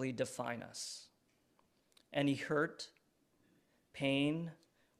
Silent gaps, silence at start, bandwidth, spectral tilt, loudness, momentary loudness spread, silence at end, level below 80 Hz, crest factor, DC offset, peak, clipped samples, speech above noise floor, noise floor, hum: none; 0 s; 13.5 kHz; -5 dB/octave; -39 LUFS; 16 LU; 0.45 s; -80 dBFS; 20 dB; under 0.1%; -22 dBFS; under 0.1%; 38 dB; -76 dBFS; none